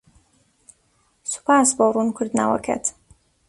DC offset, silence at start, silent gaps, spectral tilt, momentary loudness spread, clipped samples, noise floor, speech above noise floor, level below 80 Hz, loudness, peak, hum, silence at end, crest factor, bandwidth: under 0.1%; 1.25 s; none; -3.5 dB/octave; 11 LU; under 0.1%; -64 dBFS; 45 dB; -58 dBFS; -20 LUFS; -4 dBFS; none; 0.6 s; 20 dB; 11.5 kHz